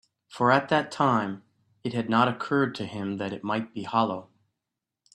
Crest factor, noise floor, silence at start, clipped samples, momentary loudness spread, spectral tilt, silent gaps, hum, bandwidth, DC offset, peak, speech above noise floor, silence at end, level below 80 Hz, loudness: 22 dB; -86 dBFS; 0.3 s; under 0.1%; 11 LU; -6.5 dB/octave; none; none; 11.5 kHz; under 0.1%; -6 dBFS; 60 dB; 0.9 s; -68 dBFS; -26 LUFS